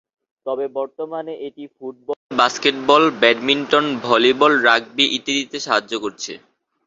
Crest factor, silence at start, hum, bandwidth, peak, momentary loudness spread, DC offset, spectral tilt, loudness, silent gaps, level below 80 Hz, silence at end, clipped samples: 18 dB; 0.45 s; none; 7.8 kHz; -2 dBFS; 17 LU; under 0.1%; -2.5 dB/octave; -17 LUFS; 2.16-2.29 s; -64 dBFS; 0.5 s; under 0.1%